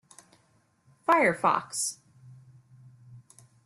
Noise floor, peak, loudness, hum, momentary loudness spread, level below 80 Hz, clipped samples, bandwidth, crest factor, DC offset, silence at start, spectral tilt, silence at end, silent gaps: -67 dBFS; -10 dBFS; -26 LUFS; none; 12 LU; -74 dBFS; under 0.1%; 15 kHz; 22 dB; under 0.1%; 1.1 s; -3 dB/octave; 0.45 s; none